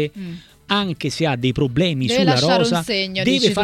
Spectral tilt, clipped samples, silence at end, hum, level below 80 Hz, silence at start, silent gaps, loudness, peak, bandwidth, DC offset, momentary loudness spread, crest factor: -5 dB/octave; under 0.1%; 0 s; none; -46 dBFS; 0 s; none; -18 LUFS; -4 dBFS; 15.5 kHz; under 0.1%; 10 LU; 16 dB